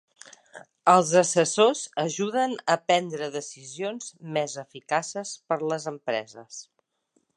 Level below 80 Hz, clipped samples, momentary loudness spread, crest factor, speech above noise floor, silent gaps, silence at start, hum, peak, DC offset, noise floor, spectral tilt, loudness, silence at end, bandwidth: -80 dBFS; under 0.1%; 18 LU; 22 dB; 46 dB; none; 0.55 s; none; -4 dBFS; under 0.1%; -71 dBFS; -3.5 dB/octave; -25 LUFS; 0.75 s; 11.5 kHz